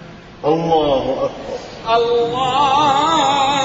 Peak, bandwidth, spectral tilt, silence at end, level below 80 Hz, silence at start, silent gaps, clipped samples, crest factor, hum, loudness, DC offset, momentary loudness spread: -4 dBFS; 8 kHz; -4 dB/octave; 0 s; -44 dBFS; 0 s; none; under 0.1%; 14 dB; none; -16 LUFS; under 0.1%; 10 LU